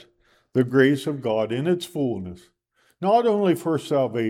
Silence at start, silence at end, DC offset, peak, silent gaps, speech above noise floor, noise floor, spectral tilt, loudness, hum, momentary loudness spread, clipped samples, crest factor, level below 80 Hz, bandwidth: 0.55 s; 0 s; under 0.1%; -4 dBFS; none; 40 dB; -62 dBFS; -6.5 dB/octave; -23 LUFS; none; 9 LU; under 0.1%; 18 dB; -64 dBFS; 16 kHz